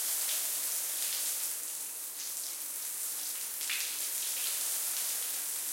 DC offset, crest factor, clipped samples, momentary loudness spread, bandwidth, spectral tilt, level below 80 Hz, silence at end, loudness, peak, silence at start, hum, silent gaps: under 0.1%; 18 dB; under 0.1%; 5 LU; 17 kHz; 3.5 dB/octave; -82 dBFS; 0 s; -32 LUFS; -18 dBFS; 0 s; none; none